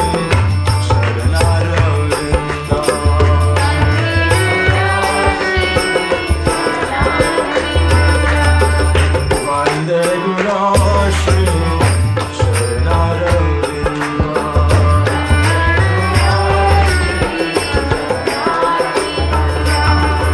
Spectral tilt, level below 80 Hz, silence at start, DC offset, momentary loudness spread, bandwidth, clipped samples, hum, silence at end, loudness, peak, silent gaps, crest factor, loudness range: -5.5 dB/octave; -20 dBFS; 0 s; under 0.1%; 4 LU; 11 kHz; under 0.1%; none; 0 s; -14 LUFS; 0 dBFS; none; 12 dB; 2 LU